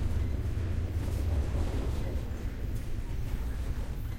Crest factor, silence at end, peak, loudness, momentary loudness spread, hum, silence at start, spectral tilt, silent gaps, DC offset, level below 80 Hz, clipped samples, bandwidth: 14 dB; 0 s; -18 dBFS; -35 LUFS; 6 LU; none; 0 s; -7 dB/octave; none; under 0.1%; -34 dBFS; under 0.1%; 16.5 kHz